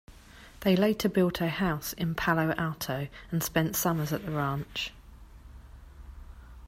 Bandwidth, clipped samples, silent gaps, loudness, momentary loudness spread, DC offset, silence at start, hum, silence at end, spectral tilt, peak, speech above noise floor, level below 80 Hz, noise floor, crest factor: 16 kHz; under 0.1%; none; -29 LUFS; 10 LU; under 0.1%; 0.1 s; none; 0 s; -5 dB/octave; -10 dBFS; 23 dB; -50 dBFS; -51 dBFS; 20 dB